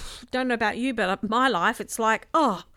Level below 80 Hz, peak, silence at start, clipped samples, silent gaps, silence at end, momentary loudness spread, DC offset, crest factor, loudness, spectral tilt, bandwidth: -50 dBFS; -8 dBFS; 0 s; under 0.1%; none; 0.15 s; 4 LU; under 0.1%; 16 dB; -24 LUFS; -3.5 dB/octave; 16 kHz